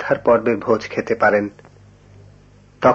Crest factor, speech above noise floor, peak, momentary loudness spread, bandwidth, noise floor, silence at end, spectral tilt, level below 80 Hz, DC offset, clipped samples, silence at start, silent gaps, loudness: 18 dB; 30 dB; -2 dBFS; 6 LU; 7.4 kHz; -48 dBFS; 0 s; -6.5 dB/octave; -52 dBFS; under 0.1%; under 0.1%; 0 s; none; -18 LUFS